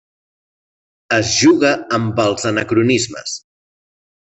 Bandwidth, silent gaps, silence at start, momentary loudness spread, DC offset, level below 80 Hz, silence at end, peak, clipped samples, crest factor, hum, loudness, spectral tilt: 8.4 kHz; none; 1.1 s; 12 LU; under 0.1%; -54 dBFS; 0.8 s; -2 dBFS; under 0.1%; 16 dB; none; -15 LUFS; -4 dB/octave